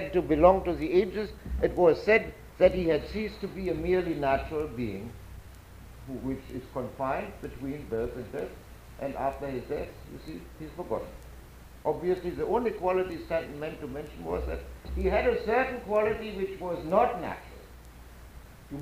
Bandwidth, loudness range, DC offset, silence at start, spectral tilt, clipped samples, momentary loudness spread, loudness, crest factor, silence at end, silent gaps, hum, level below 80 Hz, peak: 15.5 kHz; 10 LU; under 0.1%; 0 s; -7 dB/octave; under 0.1%; 21 LU; -29 LUFS; 22 dB; 0 s; none; none; -44 dBFS; -8 dBFS